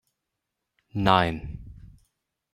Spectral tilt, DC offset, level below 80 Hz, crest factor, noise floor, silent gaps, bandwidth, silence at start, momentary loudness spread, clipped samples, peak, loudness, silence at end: -6.5 dB/octave; under 0.1%; -48 dBFS; 26 dB; -83 dBFS; none; 15 kHz; 0.95 s; 20 LU; under 0.1%; -2 dBFS; -23 LUFS; 0.65 s